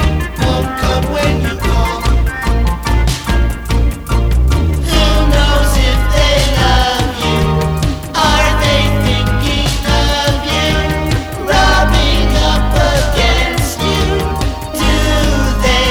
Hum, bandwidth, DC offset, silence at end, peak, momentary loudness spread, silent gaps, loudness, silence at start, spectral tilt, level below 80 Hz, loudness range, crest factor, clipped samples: none; 17 kHz; under 0.1%; 0 s; 0 dBFS; 5 LU; none; -13 LUFS; 0 s; -4.5 dB/octave; -16 dBFS; 3 LU; 12 dB; under 0.1%